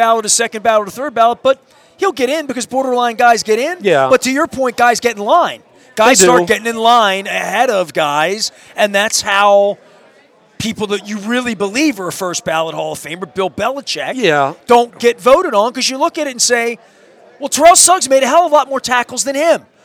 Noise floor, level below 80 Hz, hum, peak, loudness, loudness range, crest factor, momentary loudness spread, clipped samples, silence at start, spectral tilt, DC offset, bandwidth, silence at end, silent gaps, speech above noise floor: -48 dBFS; -54 dBFS; none; 0 dBFS; -13 LUFS; 6 LU; 14 dB; 10 LU; 0.1%; 0 s; -2 dB/octave; under 0.1%; over 20 kHz; 0.25 s; none; 35 dB